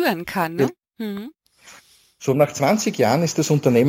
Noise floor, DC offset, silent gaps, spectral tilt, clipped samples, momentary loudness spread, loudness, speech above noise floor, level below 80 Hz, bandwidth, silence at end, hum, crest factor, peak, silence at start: -51 dBFS; under 0.1%; none; -5.5 dB/octave; under 0.1%; 13 LU; -21 LUFS; 31 dB; -62 dBFS; 17 kHz; 0 s; none; 18 dB; -4 dBFS; 0 s